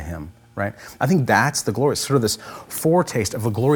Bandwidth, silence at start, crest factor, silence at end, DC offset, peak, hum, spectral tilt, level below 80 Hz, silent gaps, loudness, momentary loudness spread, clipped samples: over 20 kHz; 0 s; 18 dB; 0 s; under 0.1%; -2 dBFS; none; -5 dB/octave; -50 dBFS; none; -21 LUFS; 13 LU; under 0.1%